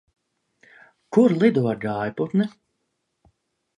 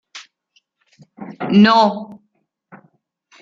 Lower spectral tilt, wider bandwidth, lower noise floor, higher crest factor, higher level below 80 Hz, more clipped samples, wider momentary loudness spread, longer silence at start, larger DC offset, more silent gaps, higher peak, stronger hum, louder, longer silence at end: first, -8.5 dB/octave vs -6.5 dB/octave; first, 9.8 kHz vs 7.4 kHz; first, -76 dBFS vs -68 dBFS; about the same, 20 dB vs 18 dB; about the same, -66 dBFS vs -64 dBFS; neither; second, 9 LU vs 27 LU; first, 1.1 s vs 0.15 s; neither; neither; about the same, -4 dBFS vs -2 dBFS; neither; second, -22 LUFS vs -14 LUFS; about the same, 1.3 s vs 1.25 s